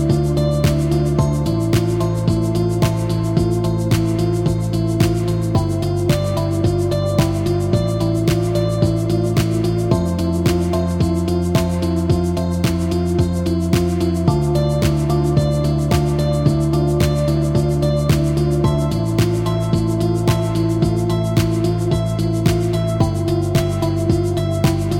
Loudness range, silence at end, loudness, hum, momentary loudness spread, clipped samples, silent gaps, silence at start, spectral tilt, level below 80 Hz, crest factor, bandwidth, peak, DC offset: 1 LU; 0 s; -18 LUFS; none; 2 LU; under 0.1%; none; 0 s; -7 dB/octave; -30 dBFS; 14 dB; 17 kHz; -2 dBFS; under 0.1%